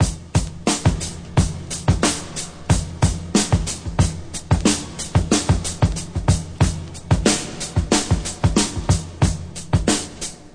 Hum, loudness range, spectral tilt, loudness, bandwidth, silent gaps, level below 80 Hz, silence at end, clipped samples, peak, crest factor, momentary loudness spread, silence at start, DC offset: none; 1 LU; -4.5 dB/octave; -21 LUFS; 10.5 kHz; none; -30 dBFS; 0 s; under 0.1%; -2 dBFS; 18 dB; 6 LU; 0 s; under 0.1%